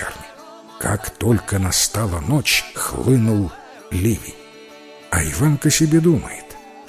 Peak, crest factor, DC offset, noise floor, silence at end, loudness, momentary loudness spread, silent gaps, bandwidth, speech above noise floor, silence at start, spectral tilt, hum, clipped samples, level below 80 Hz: -4 dBFS; 16 dB; under 0.1%; -41 dBFS; 0.05 s; -19 LUFS; 19 LU; none; 16 kHz; 23 dB; 0 s; -4.5 dB/octave; none; under 0.1%; -36 dBFS